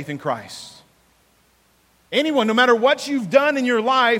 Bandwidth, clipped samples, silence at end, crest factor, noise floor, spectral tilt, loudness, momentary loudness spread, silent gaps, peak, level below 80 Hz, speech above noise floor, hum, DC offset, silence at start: 16 kHz; under 0.1%; 0 s; 18 dB; -59 dBFS; -4 dB/octave; -18 LUFS; 16 LU; none; -2 dBFS; -68 dBFS; 41 dB; none; under 0.1%; 0 s